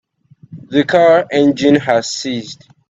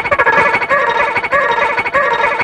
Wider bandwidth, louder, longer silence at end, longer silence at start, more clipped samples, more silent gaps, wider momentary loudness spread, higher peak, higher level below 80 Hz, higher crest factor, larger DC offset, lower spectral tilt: second, 8 kHz vs 11 kHz; about the same, -13 LUFS vs -12 LUFS; first, 0.35 s vs 0 s; first, 0.5 s vs 0 s; neither; neither; first, 12 LU vs 3 LU; about the same, 0 dBFS vs 0 dBFS; second, -56 dBFS vs -44 dBFS; about the same, 14 dB vs 14 dB; neither; about the same, -5 dB/octave vs -4 dB/octave